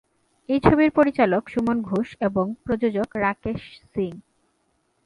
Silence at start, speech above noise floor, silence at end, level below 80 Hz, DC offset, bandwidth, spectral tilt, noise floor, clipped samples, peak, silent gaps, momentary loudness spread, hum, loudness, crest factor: 0.5 s; 47 dB; 0.85 s; -46 dBFS; under 0.1%; 11 kHz; -8.5 dB/octave; -69 dBFS; under 0.1%; -2 dBFS; none; 13 LU; none; -23 LUFS; 22 dB